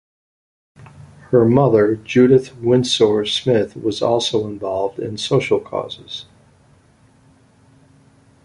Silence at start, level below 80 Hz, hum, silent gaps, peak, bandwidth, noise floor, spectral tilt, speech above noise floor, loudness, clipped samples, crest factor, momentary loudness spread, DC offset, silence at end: 0.8 s; -52 dBFS; none; none; -2 dBFS; 11 kHz; -53 dBFS; -6 dB/octave; 36 dB; -17 LUFS; under 0.1%; 16 dB; 13 LU; under 0.1%; 2.25 s